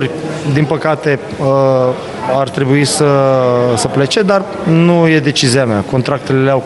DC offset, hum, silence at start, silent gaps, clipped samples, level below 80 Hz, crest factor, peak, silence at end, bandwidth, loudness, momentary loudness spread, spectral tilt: 0.1%; none; 0 s; none; under 0.1%; -46 dBFS; 12 dB; 0 dBFS; 0 s; 12 kHz; -12 LUFS; 6 LU; -5.5 dB/octave